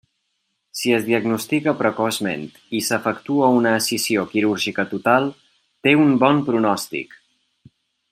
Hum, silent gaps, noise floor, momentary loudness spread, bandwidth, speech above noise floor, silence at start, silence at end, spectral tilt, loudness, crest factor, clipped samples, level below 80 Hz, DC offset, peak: none; none; -73 dBFS; 11 LU; 16 kHz; 54 dB; 0.75 s; 1.1 s; -4.5 dB/octave; -19 LUFS; 18 dB; under 0.1%; -66 dBFS; under 0.1%; -2 dBFS